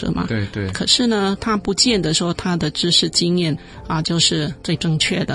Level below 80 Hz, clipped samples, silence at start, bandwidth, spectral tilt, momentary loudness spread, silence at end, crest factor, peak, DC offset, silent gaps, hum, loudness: -42 dBFS; under 0.1%; 0 s; 11.5 kHz; -4 dB/octave; 8 LU; 0 s; 18 dB; -2 dBFS; under 0.1%; none; none; -18 LUFS